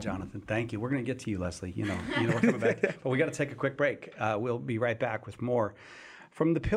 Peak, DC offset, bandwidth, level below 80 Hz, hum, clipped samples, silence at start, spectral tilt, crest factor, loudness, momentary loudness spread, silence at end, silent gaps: -10 dBFS; under 0.1%; 12.5 kHz; -54 dBFS; none; under 0.1%; 0 s; -6.5 dB/octave; 20 dB; -31 LUFS; 9 LU; 0 s; none